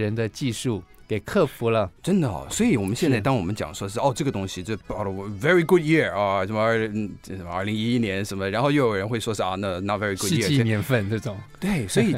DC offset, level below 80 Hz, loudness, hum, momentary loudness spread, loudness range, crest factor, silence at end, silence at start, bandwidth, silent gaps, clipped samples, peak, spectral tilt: under 0.1%; -50 dBFS; -24 LUFS; none; 9 LU; 2 LU; 18 dB; 0 s; 0 s; 16 kHz; none; under 0.1%; -6 dBFS; -5.5 dB/octave